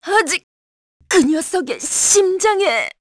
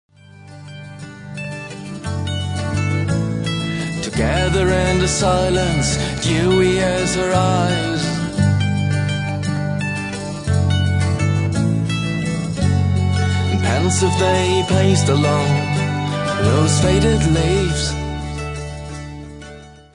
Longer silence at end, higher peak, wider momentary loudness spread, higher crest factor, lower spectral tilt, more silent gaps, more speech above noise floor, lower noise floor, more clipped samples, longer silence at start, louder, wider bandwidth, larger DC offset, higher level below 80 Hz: about the same, 0.1 s vs 0.2 s; about the same, -2 dBFS vs -2 dBFS; second, 8 LU vs 14 LU; about the same, 16 dB vs 16 dB; second, -1 dB/octave vs -5.5 dB/octave; first, 0.43-1.00 s vs none; first, over 74 dB vs 25 dB; first, under -90 dBFS vs -40 dBFS; neither; second, 0.05 s vs 0.35 s; about the same, -16 LUFS vs -18 LUFS; about the same, 11 kHz vs 10.5 kHz; neither; second, -56 dBFS vs -34 dBFS